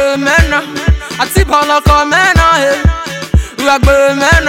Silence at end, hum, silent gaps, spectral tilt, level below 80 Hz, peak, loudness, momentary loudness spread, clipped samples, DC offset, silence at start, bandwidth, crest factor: 0 s; none; none; -4.5 dB/octave; -16 dBFS; 0 dBFS; -10 LUFS; 7 LU; under 0.1%; 0.2%; 0 s; 16.5 kHz; 10 dB